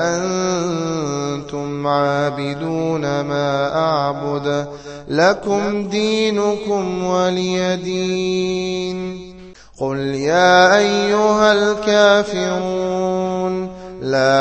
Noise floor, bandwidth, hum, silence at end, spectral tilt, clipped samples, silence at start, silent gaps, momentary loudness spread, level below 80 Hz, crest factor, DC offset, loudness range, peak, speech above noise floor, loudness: -39 dBFS; 8.6 kHz; none; 0 s; -4.5 dB/octave; under 0.1%; 0 s; none; 11 LU; -50 dBFS; 18 dB; under 0.1%; 6 LU; 0 dBFS; 23 dB; -18 LUFS